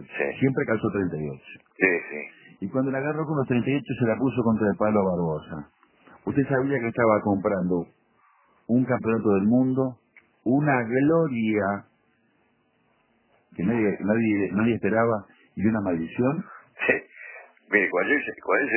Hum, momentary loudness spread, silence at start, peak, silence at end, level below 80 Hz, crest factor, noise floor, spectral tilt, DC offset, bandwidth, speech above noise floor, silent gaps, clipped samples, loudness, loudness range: none; 14 LU; 0 s; -4 dBFS; 0 s; -56 dBFS; 20 dB; -67 dBFS; -11.5 dB/octave; under 0.1%; 3.2 kHz; 43 dB; none; under 0.1%; -24 LUFS; 3 LU